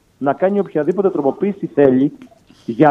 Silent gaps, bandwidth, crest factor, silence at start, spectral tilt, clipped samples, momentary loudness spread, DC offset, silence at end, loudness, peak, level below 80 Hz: none; 6.6 kHz; 16 dB; 0.2 s; -9.5 dB/octave; under 0.1%; 8 LU; under 0.1%; 0 s; -17 LUFS; 0 dBFS; -58 dBFS